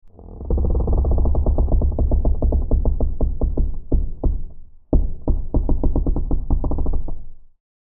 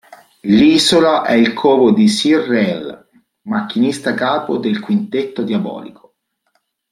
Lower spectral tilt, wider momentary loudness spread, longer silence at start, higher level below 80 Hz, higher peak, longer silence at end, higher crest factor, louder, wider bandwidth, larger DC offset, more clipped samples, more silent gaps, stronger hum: first, -15.5 dB/octave vs -5 dB/octave; second, 7 LU vs 12 LU; second, 0.05 s vs 0.45 s; first, -20 dBFS vs -54 dBFS; about the same, -2 dBFS vs -2 dBFS; second, 0.35 s vs 1 s; about the same, 16 dB vs 14 dB; second, -23 LUFS vs -14 LUFS; second, 1.4 kHz vs 13.5 kHz; neither; neither; neither; neither